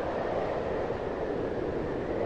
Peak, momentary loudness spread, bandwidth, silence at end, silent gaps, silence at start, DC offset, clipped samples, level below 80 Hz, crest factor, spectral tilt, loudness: -18 dBFS; 2 LU; 9 kHz; 0 s; none; 0 s; under 0.1%; under 0.1%; -48 dBFS; 12 dB; -7.5 dB/octave; -32 LUFS